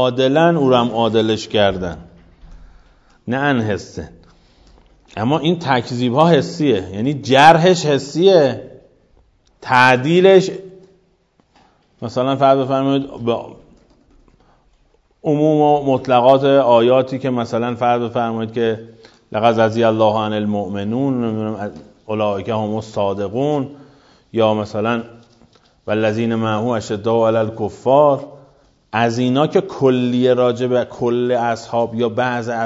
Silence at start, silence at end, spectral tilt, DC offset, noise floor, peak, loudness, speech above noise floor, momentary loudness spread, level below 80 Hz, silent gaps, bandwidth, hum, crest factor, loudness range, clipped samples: 0 s; 0 s; -6 dB/octave; under 0.1%; -59 dBFS; 0 dBFS; -16 LUFS; 43 dB; 13 LU; -52 dBFS; none; 11 kHz; none; 16 dB; 7 LU; under 0.1%